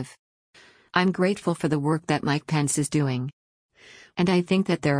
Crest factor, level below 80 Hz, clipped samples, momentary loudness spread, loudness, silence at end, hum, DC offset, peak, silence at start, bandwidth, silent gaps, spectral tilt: 18 dB; -60 dBFS; under 0.1%; 7 LU; -24 LUFS; 0 s; none; under 0.1%; -8 dBFS; 0 s; 10.5 kHz; 0.19-0.53 s, 3.33-3.69 s; -5.5 dB/octave